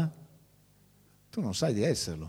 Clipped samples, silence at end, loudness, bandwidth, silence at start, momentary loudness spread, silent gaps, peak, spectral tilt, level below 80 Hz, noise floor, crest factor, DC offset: under 0.1%; 0 s; -31 LUFS; 16 kHz; 0 s; 8 LU; none; -14 dBFS; -5 dB/octave; -58 dBFS; -63 dBFS; 18 dB; under 0.1%